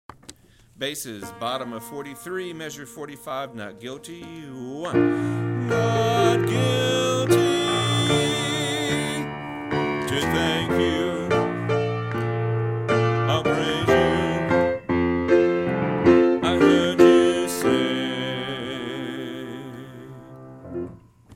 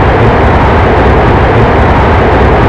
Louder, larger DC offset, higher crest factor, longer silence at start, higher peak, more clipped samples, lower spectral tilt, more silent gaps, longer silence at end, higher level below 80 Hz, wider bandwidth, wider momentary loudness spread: second, -22 LUFS vs -6 LUFS; second, under 0.1% vs 2%; first, 20 dB vs 6 dB; first, 0.3 s vs 0 s; about the same, -2 dBFS vs 0 dBFS; second, under 0.1% vs 2%; second, -5.5 dB/octave vs -8 dB/octave; neither; about the same, 0 s vs 0 s; second, -50 dBFS vs -12 dBFS; first, 16 kHz vs 8 kHz; first, 18 LU vs 0 LU